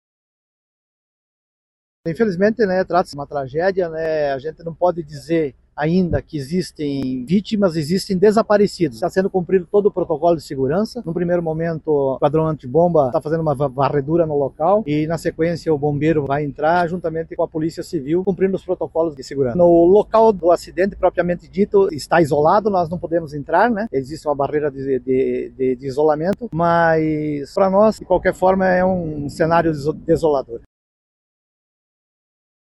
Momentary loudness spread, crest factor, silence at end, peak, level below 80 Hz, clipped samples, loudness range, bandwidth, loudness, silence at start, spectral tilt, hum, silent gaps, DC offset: 9 LU; 16 dB; 2.1 s; -4 dBFS; -46 dBFS; under 0.1%; 5 LU; 12.5 kHz; -18 LUFS; 2.05 s; -7.5 dB/octave; none; none; under 0.1%